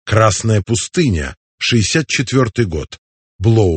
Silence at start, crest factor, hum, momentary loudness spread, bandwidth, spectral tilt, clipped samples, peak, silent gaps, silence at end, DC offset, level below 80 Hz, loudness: 0.05 s; 16 dB; none; 8 LU; 8.8 kHz; -5 dB/octave; under 0.1%; 0 dBFS; 1.37-1.58 s, 2.98-3.39 s; 0 s; under 0.1%; -34 dBFS; -16 LUFS